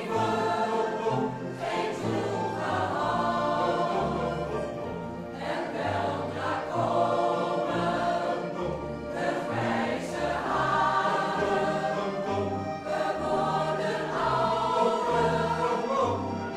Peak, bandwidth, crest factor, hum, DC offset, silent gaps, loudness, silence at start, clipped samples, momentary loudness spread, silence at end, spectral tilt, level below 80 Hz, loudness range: -12 dBFS; 13.5 kHz; 16 dB; none; under 0.1%; none; -28 LUFS; 0 s; under 0.1%; 7 LU; 0 s; -6 dB/octave; -54 dBFS; 3 LU